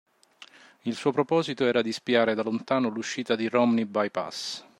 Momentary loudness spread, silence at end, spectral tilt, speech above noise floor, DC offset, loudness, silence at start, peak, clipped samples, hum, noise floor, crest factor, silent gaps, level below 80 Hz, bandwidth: 9 LU; 0.2 s; -5 dB/octave; 27 dB; under 0.1%; -26 LUFS; 0.4 s; -8 dBFS; under 0.1%; none; -53 dBFS; 18 dB; none; -72 dBFS; 12 kHz